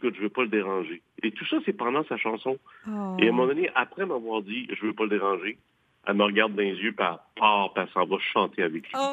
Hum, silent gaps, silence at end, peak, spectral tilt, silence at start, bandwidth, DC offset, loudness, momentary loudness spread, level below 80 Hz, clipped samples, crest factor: none; none; 0 s; -6 dBFS; -6 dB/octave; 0 s; 8.4 kHz; under 0.1%; -27 LUFS; 10 LU; -80 dBFS; under 0.1%; 22 dB